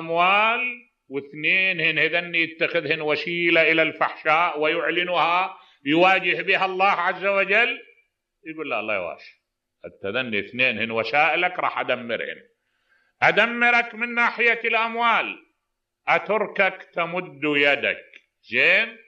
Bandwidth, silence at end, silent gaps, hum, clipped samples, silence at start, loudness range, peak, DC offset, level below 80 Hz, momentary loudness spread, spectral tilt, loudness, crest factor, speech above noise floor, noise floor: 8 kHz; 0.1 s; none; none; under 0.1%; 0 s; 4 LU; -4 dBFS; under 0.1%; -76 dBFS; 13 LU; -5 dB/octave; -21 LUFS; 18 dB; 57 dB; -79 dBFS